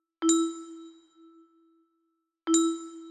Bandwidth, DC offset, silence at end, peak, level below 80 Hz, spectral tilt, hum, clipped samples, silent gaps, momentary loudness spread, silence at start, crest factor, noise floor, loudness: 12.5 kHz; under 0.1%; 0 s; -10 dBFS; -78 dBFS; -1 dB/octave; none; under 0.1%; none; 19 LU; 0.2 s; 20 dB; -78 dBFS; -27 LUFS